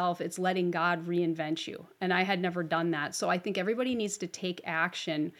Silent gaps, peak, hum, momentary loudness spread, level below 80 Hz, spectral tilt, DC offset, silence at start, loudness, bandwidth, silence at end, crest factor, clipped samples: none; -12 dBFS; none; 6 LU; -80 dBFS; -4.5 dB/octave; under 0.1%; 0 s; -31 LUFS; 15 kHz; 0.1 s; 18 dB; under 0.1%